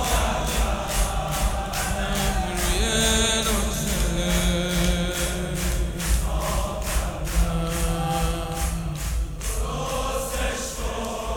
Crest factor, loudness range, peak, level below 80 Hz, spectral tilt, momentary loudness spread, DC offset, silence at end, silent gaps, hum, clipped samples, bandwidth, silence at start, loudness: 18 dB; 4 LU; -6 dBFS; -28 dBFS; -3.5 dB/octave; 7 LU; under 0.1%; 0 s; none; none; under 0.1%; over 20 kHz; 0 s; -25 LUFS